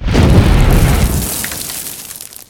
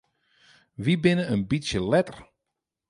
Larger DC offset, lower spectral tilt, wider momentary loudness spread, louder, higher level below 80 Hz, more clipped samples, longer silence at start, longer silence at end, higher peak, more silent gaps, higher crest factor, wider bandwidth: neither; second, -5 dB/octave vs -6.5 dB/octave; first, 14 LU vs 7 LU; first, -13 LUFS vs -25 LUFS; first, -16 dBFS vs -52 dBFS; first, 0.3% vs under 0.1%; second, 0 s vs 0.8 s; second, 0.15 s vs 0.65 s; first, 0 dBFS vs -8 dBFS; neither; second, 12 dB vs 20 dB; first, 20 kHz vs 11 kHz